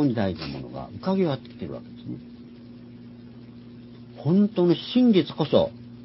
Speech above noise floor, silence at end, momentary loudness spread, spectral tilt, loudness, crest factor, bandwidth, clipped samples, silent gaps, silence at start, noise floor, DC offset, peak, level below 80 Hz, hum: 20 dB; 0 s; 24 LU; -11.5 dB/octave; -24 LUFS; 20 dB; 5.8 kHz; under 0.1%; none; 0 s; -44 dBFS; under 0.1%; -6 dBFS; -54 dBFS; 60 Hz at -45 dBFS